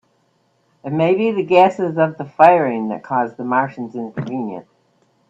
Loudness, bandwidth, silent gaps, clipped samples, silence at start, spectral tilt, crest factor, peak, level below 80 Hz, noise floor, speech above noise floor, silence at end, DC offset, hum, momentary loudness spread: -17 LUFS; 7.8 kHz; none; under 0.1%; 0.85 s; -8 dB/octave; 18 dB; 0 dBFS; -64 dBFS; -62 dBFS; 45 dB; 0.7 s; under 0.1%; none; 15 LU